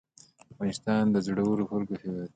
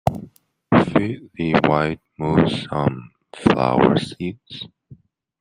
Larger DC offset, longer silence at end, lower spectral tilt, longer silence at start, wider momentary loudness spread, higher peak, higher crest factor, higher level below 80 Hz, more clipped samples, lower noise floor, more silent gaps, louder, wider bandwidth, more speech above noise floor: neither; second, 0.1 s vs 0.45 s; about the same, -7 dB/octave vs -7.5 dB/octave; first, 0.6 s vs 0.05 s; second, 9 LU vs 18 LU; second, -14 dBFS vs -2 dBFS; about the same, 16 dB vs 20 dB; second, -62 dBFS vs -48 dBFS; neither; first, -55 dBFS vs -48 dBFS; neither; second, -29 LUFS vs -20 LUFS; second, 9.2 kHz vs 12.5 kHz; about the same, 27 dB vs 29 dB